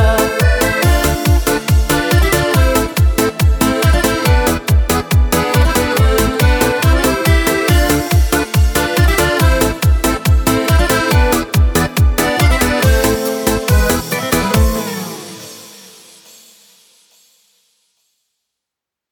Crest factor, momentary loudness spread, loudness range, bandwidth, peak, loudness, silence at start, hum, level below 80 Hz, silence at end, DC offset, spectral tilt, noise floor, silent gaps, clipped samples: 14 dB; 3 LU; 5 LU; 19.5 kHz; 0 dBFS; -13 LUFS; 0 s; none; -18 dBFS; 3.4 s; under 0.1%; -5 dB/octave; -83 dBFS; none; under 0.1%